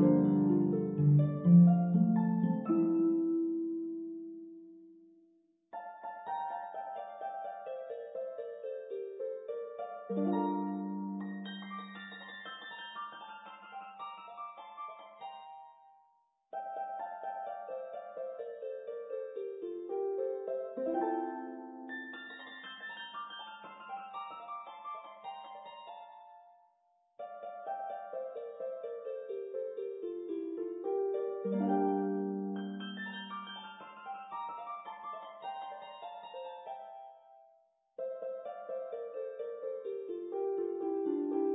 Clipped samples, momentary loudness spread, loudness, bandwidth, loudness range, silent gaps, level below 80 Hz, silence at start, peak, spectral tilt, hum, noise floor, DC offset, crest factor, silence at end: under 0.1%; 17 LU; -36 LUFS; 3.9 kHz; 13 LU; none; -80 dBFS; 0 s; -14 dBFS; -7 dB/octave; none; -73 dBFS; under 0.1%; 22 dB; 0 s